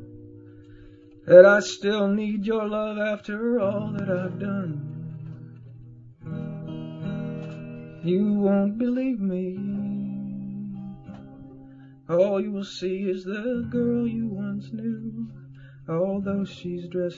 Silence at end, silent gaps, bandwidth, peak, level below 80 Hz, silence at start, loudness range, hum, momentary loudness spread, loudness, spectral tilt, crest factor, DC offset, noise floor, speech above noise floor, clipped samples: 0 s; none; 7.8 kHz; 0 dBFS; -58 dBFS; 0 s; 12 LU; none; 19 LU; -25 LUFS; -7 dB/octave; 24 dB; under 0.1%; -48 dBFS; 25 dB; under 0.1%